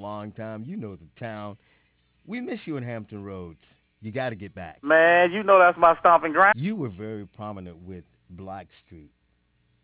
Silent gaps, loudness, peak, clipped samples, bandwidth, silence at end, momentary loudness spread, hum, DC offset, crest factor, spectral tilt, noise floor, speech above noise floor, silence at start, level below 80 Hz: none; -20 LUFS; -6 dBFS; under 0.1%; 4 kHz; 0.85 s; 24 LU; none; under 0.1%; 20 dB; -9 dB/octave; -68 dBFS; 44 dB; 0 s; -58 dBFS